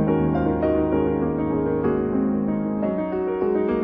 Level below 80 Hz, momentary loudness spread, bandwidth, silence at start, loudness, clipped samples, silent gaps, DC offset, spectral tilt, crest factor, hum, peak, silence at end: -40 dBFS; 3 LU; 4.3 kHz; 0 s; -22 LUFS; under 0.1%; none; under 0.1%; -12 dB/octave; 14 dB; none; -8 dBFS; 0 s